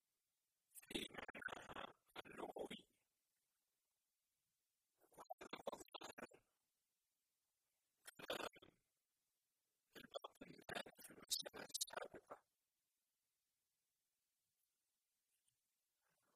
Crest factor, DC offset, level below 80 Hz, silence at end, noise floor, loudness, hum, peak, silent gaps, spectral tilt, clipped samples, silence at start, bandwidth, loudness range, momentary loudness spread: 30 dB; under 0.1%; -86 dBFS; 3.95 s; under -90 dBFS; -53 LUFS; none; -28 dBFS; 1.30-1.34 s, 5.33-5.38 s, 6.13-6.17 s; -1.5 dB/octave; under 0.1%; 0.75 s; 15.5 kHz; 9 LU; 17 LU